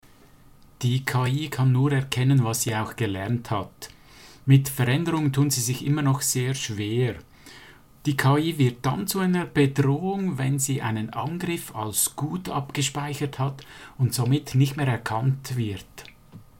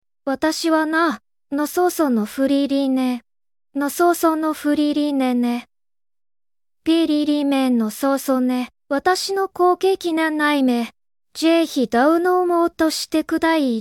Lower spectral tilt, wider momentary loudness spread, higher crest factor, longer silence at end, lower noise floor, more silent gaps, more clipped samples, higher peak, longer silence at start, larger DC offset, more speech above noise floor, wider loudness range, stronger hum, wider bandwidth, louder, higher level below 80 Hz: first, -5 dB/octave vs -3.5 dB/octave; about the same, 9 LU vs 7 LU; first, 20 dB vs 14 dB; first, 0.2 s vs 0 s; second, -53 dBFS vs under -90 dBFS; neither; neither; about the same, -6 dBFS vs -4 dBFS; first, 0.8 s vs 0.25 s; first, 0.1% vs under 0.1%; second, 29 dB vs over 72 dB; about the same, 3 LU vs 2 LU; neither; about the same, 17 kHz vs 17 kHz; second, -24 LUFS vs -19 LUFS; about the same, -56 dBFS vs -60 dBFS